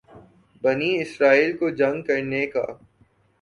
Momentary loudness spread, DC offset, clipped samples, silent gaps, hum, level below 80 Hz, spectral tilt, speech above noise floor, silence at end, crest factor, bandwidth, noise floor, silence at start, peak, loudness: 9 LU; under 0.1%; under 0.1%; none; none; -64 dBFS; -6 dB/octave; 39 dB; 0.65 s; 20 dB; 11 kHz; -61 dBFS; 0.15 s; -4 dBFS; -22 LUFS